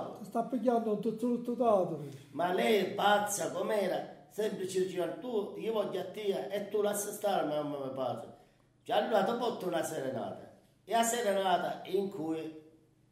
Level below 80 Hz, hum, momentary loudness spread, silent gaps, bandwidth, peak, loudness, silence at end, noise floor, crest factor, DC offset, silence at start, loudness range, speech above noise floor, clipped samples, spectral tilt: -80 dBFS; none; 9 LU; none; 16 kHz; -16 dBFS; -33 LUFS; 0.45 s; -64 dBFS; 18 dB; under 0.1%; 0 s; 4 LU; 32 dB; under 0.1%; -4 dB/octave